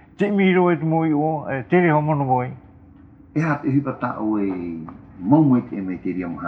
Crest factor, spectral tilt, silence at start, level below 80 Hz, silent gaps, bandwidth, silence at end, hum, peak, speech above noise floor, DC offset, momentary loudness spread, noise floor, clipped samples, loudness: 18 dB; -9.5 dB/octave; 0.2 s; -56 dBFS; none; 6.2 kHz; 0 s; none; -2 dBFS; 27 dB; under 0.1%; 12 LU; -46 dBFS; under 0.1%; -20 LUFS